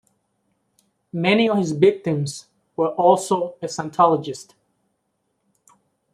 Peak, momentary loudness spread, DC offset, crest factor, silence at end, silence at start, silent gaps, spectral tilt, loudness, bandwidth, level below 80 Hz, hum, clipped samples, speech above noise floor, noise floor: -2 dBFS; 16 LU; under 0.1%; 20 dB; 1.7 s; 1.15 s; none; -5.5 dB/octave; -20 LUFS; 14 kHz; -68 dBFS; none; under 0.1%; 53 dB; -73 dBFS